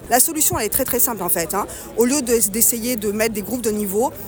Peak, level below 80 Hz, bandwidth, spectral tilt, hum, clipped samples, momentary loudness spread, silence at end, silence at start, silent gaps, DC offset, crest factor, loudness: 0 dBFS; -44 dBFS; over 20 kHz; -3 dB/octave; none; under 0.1%; 8 LU; 0 s; 0 s; none; under 0.1%; 18 dB; -18 LUFS